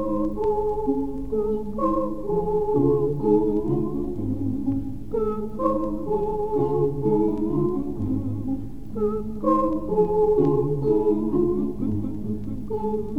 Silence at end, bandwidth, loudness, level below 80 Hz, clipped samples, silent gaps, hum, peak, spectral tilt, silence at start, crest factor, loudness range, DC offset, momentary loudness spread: 0 s; 4.5 kHz; -24 LUFS; -40 dBFS; under 0.1%; none; none; -8 dBFS; -11 dB/octave; 0 s; 16 dB; 3 LU; 2%; 8 LU